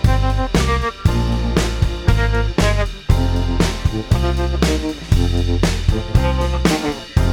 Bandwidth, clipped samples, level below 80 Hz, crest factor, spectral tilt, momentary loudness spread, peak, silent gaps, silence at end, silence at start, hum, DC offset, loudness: 17 kHz; under 0.1%; -20 dBFS; 16 dB; -6 dB/octave; 2 LU; 0 dBFS; none; 0 s; 0 s; none; under 0.1%; -18 LUFS